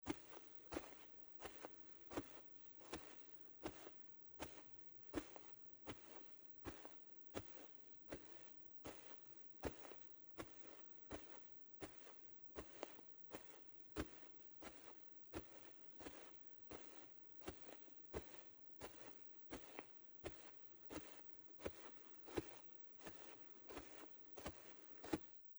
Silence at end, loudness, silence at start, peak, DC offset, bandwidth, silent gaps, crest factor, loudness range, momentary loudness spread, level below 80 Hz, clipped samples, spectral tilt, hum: 0 s; -55 LUFS; 0 s; -28 dBFS; under 0.1%; over 20 kHz; none; 28 dB; 1 LU; 5 LU; -72 dBFS; under 0.1%; -4.5 dB/octave; none